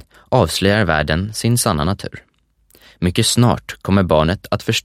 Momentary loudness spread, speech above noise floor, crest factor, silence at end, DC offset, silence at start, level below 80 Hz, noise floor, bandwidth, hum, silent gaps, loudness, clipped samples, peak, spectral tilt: 8 LU; 38 dB; 18 dB; 0.05 s; under 0.1%; 0.3 s; -36 dBFS; -55 dBFS; 16 kHz; none; none; -17 LUFS; under 0.1%; 0 dBFS; -5 dB/octave